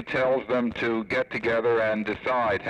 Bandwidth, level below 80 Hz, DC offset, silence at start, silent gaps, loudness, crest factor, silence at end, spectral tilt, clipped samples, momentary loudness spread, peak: 9.4 kHz; -56 dBFS; under 0.1%; 0 s; none; -25 LUFS; 10 dB; 0 s; -6.5 dB/octave; under 0.1%; 4 LU; -14 dBFS